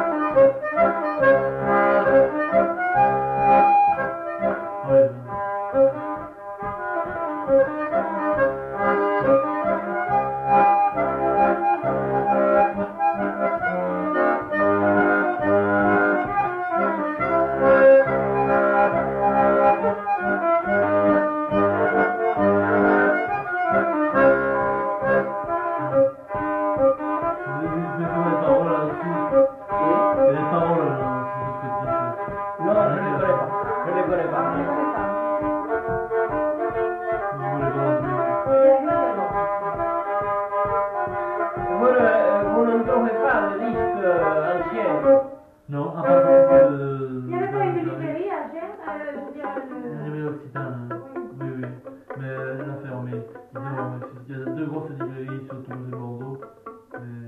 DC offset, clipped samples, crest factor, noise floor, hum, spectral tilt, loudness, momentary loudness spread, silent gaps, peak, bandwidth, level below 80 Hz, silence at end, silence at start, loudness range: under 0.1%; under 0.1%; 14 dB; -43 dBFS; none; -9.5 dB/octave; -21 LUFS; 14 LU; none; -6 dBFS; 4.5 kHz; -52 dBFS; 0 s; 0 s; 13 LU